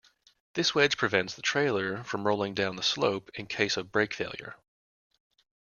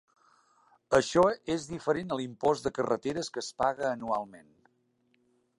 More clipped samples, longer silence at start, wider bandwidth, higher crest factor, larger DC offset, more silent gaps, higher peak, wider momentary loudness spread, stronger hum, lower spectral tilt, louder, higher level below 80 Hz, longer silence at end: neither; second, 0.55 s vs 0.9 s; second, 7.4 kHz vs 11.5 kHz; about the same, 22 dB vs 22 dB; neither; neither; about the same, -8 dBFS vs -10 dBFS; first, 12 LU vs 9 LU; neither; about the same, -3.5 dB/octave vs -4.5 dB/octave; about the same, -28 LUFS vs -30 LUFS; second, -68 dBFS vs -62 dBFS; about the same, 1.1 s vs 1.2 s